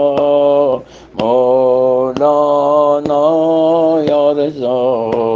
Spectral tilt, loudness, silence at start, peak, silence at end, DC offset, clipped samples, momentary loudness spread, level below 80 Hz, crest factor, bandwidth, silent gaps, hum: -7.5 dB/octave; -12 LUFS; 0 s; 0 dBFS; 0 s; under 0.1%; under 0.1%; 5 LU; -52 dBFS; 12 dB; 7.2 kHz; none; none